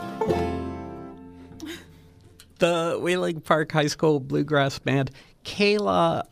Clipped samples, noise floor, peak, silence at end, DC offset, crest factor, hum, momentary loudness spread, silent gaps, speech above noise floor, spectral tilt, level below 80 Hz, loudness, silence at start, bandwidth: under 0.1%; -52 dBFS; -6 dBFS; 0.1 s; under 0.1%; 20 dB; none; 19 LU; none; 29 dB; -5.5 dB/octave; -52 dBFS; -24 LUFS; 0 s; 15.5 kHz